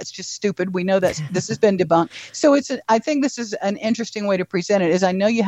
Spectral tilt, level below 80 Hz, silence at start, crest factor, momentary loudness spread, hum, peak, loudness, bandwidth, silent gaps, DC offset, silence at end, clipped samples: -5 dB/octave; -58 dBFS; 0 s; 16 dB; 7 LU; none; -2 dBFS; -20 LUFS; 13.5 kHz; none; under 0.1%; 0 s; under 0.1%